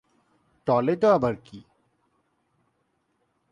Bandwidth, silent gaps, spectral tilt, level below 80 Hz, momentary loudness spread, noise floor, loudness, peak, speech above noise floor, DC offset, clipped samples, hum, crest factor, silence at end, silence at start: 9.8 kHz; none; -8 dB/octave; -62 dBFS; 13 LU; -73 dBFS; -23 LUFS; -8 dBFS; 50 dB; under 0.1%; under 0.1%; none; 20 dB; 1.9 s; 0.65 s